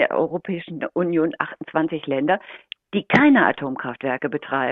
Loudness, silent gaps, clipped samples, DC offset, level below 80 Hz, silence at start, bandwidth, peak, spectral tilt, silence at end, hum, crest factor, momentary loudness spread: -21 LUFS; none; under 0.1%; under 0.1%; -62 dBFS; 0 s; 6.8 kHz; -2 dBFS; -7.5 dB/octave; 0 s; none; 20 dB; 13 LU